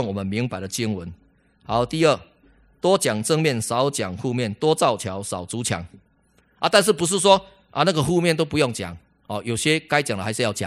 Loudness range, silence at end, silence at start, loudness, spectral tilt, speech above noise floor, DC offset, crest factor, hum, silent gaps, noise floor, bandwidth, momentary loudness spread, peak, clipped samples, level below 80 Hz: 3 LU; 0 s; 0 s; -22 LUFS; -4 dB/octave; 40 dB; under 0.1%; 22 dB; none; none; -61 dBFS; 16 kHz; 11 LU; 0 dBFS; under 0.1%; -54 dBFS